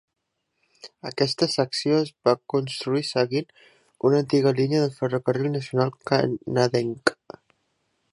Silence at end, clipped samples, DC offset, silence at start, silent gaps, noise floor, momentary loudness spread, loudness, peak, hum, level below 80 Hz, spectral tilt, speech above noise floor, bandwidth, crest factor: 1 s; under 0.1%; under 0.1%; 0.85 s; none; -74 dBFS; 5 LU; -24 LUFS; -2 dBFS; none; -68 dBFS; -6 dB/octave; 51 dB; 11.5 kHz; 22 dB